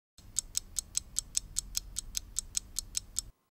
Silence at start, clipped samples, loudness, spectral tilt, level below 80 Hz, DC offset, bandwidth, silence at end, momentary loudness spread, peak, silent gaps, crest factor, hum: 0.2 s; under 0.1%; -36 LUFS; 0.5 dB/octave; -50 dBFS; under 0.1%; 17 kHz; 0.2 s; 4 LU; -8 dBFS; none; 32 dB; none